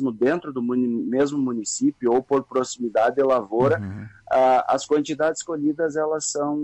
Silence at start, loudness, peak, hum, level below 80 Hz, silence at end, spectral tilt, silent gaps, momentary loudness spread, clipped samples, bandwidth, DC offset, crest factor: 0 s; -22 LUFS; -10 dBFS; none; -62 dBFS; 0 s; -5 dB/octave; none; 6 LU; under 0.1%; 9 kHz; under 0.1%; 12 dB